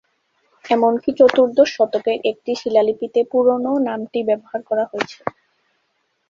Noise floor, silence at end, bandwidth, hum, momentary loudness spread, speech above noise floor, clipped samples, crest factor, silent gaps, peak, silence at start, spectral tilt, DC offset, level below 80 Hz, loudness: -69 dBFS; 1 s; 7.2 kHz; none; 10 LU; 51 dB; under 0.1%; 18 dB; none; -2 dBFS; 0.65 s; -5 dB/octave; under 0.1%; -62 dBFS; -18 LUFS